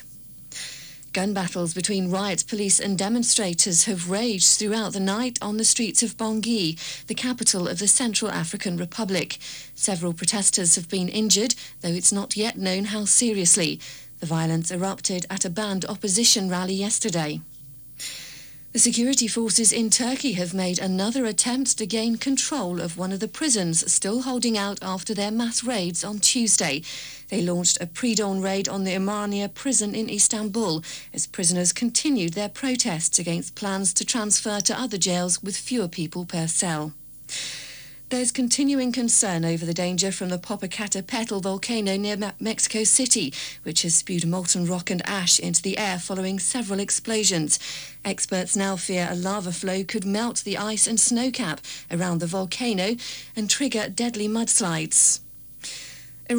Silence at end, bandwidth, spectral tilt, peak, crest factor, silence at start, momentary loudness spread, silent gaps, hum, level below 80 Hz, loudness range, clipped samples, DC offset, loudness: 0 s; over 20 kHz; -2.5 dB/octave; -8 dBFS; 18 dB; 0 s; 12 LU; none; none; -62 dBFS; 4 LU; under 0.1%; under 0.1%; -22 LUFS